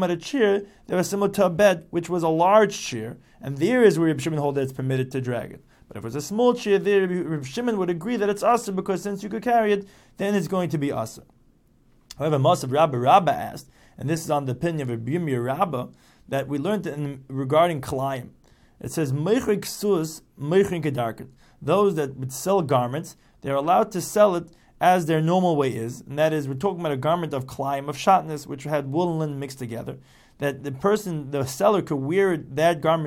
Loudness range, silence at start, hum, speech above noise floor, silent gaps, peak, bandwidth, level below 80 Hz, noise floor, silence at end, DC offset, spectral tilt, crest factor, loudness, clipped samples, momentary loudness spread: 4 LU; 0 s; none; 36 dB; none; -4 dBFS; 17 kHz; -58 dBFS; -58 dBFS; 0 s; under 0.1%; -6 dB/octave; 20 dB; -23 LUFS; under 0.1%; 13 LU